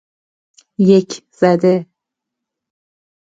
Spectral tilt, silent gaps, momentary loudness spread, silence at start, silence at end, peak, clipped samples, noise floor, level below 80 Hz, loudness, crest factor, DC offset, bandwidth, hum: -7 dB/octave; none; 14 LU; 0.8 s; 1.4 s; 0 dBFS; under 0.1%; -81 dBFS; -62 dBFS; -14 LUFS; 18 dB; under 0.1%; 7.8 kHz; none